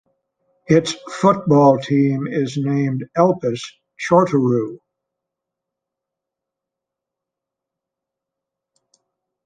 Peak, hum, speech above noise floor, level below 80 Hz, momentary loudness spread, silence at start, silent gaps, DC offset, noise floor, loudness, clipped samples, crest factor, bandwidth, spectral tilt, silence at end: -2 dBFS; none; 68 dB; -60 dBFS; 12 LU; 0.7 s; none; under 0.1%; -84 dBFS; -17 LUFS; under 0.1%; 20 dB; 9.6 kHz; -7 dB/octave; 4.7 s